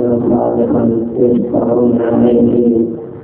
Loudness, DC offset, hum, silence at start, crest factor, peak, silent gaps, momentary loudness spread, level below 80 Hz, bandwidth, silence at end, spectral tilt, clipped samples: -12 LUFS; under 0.1%; none; 0 s; 12 dB; 0 dBFS; none; 4 LU; -42 dBFS; 3.3 kHz; 0 s; -13.5 dB/octave; under 0.1%